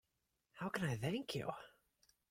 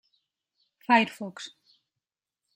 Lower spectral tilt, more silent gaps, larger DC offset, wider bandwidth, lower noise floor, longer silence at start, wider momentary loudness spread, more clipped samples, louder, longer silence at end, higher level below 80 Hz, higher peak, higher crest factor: first, -5.5 dB/octave vs -4 dB/octave; neither; neither; about the same, 16.5 kHz vs 16 kHz; about the same, -87 dBFS vs -89 dBFS; second, 0.55 s vs 0.9 s; second, 12 LU vs 21 LU; neither; second, -43 LUFS vs -24 LUFS; second, 0.6 s vs 1.1 s; first, -72 dBFS vs -84 dBFS; second, -26 dBFS vs -6 dBFS; about the same, 20 dB vs 24 dB